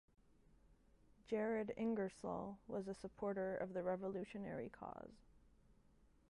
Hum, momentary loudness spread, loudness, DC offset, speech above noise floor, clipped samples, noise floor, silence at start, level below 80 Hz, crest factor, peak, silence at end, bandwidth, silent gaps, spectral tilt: none; 10 LU; -45 LUFS; under 0.1%; 27 dB; under 0.1%; -71 dBFS; 0.7 s; -72 dBFS; 16 dB; -30 dBFS; 0.85 s; 11 kHz; none; -7.5 dB/octave